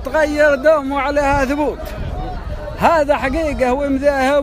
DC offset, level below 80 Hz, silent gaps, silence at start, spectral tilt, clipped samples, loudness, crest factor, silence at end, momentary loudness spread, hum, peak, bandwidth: under 0.1%; -30 dBFS; none; 0 s; -5.5 dB/octave; under 0.1%; -16 LUFS; 16 dB; 0 s; 13 LU; none; 0 dBFS; 15.5 kHz